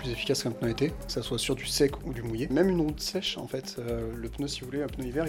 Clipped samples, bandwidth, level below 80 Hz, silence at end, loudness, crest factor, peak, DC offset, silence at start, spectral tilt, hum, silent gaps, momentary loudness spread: under 0.1%; 17 kHz; -44 dBFS; 0 s; -30 LUFS; 18 dB; -12 dBFS; under 0.1%; 0 s; -4.5 dB/octave; none; none; 9 LU